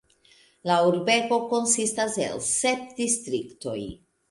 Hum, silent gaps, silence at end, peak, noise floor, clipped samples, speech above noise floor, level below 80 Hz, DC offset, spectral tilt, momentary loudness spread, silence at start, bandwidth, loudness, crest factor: none; none; 0.35 s; -8 dBFS; -59 dBFS; under 0.1%; 34 dB; -60 dBFS; under 0.1%; -2.5 dB/octave; 12 LU; 0.65 s; 11.5 kHz; -24 LUFS; 18 dB